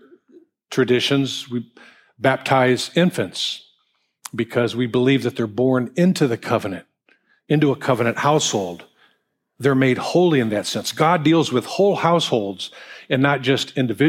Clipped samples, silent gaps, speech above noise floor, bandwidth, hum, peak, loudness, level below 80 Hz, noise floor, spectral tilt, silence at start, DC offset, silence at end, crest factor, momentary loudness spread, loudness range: under 0.1%; none; 49 dB; 16 kHz; none; -2 dBFS; -19 LUFS; -66 dBFS; -68 dBFS; -5 dB/octave; 0.7 s; under 0.1%; 0 s; 18 dB; 12 LU; 3 LU